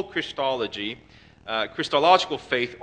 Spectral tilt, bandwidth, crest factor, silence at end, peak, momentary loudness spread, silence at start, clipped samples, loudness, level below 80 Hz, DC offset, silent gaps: -3.5 dB/octave; 9.6 kHz; 22 dB; 0 s; -2 dBFS; 14 LU; 0 s; under 0.1%; -24 LUFS; -60 dBFS; under 0.1%; none